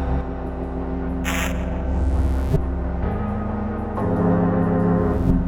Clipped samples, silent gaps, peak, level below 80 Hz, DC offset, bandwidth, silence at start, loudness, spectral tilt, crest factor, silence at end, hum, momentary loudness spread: under 0.1%; none; -6 dBFS; -26 dBFS; under 0.1%; over 20 kHz; 0 s; -23 LUFS; -7.5 dB/octave; 14 dB; 0 s; none; 8 LU